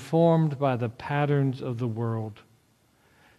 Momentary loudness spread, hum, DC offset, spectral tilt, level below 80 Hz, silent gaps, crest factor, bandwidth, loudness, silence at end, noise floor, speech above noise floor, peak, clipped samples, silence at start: 9 LU; none; under 0.1%; -8.5 dB/octave; -64 dBFS; none; 16 dB; 11.5 kHz; -26 LUFS; 1.05 s; -64 dBFS; 39 dB; -10 dBFS; under 0.1%; 0 s